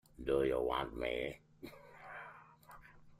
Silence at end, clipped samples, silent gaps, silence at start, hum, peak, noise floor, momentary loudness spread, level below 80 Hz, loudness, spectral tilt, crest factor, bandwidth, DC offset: 0.05 s; under 0.1%; none; 0.2 s; none; -22 dBFS; -59 dBFS; 24 LU; -58 dBFS; -37 LUFS; -6 dB/octave; 18 dB; 15.5 kHz; under 0.1%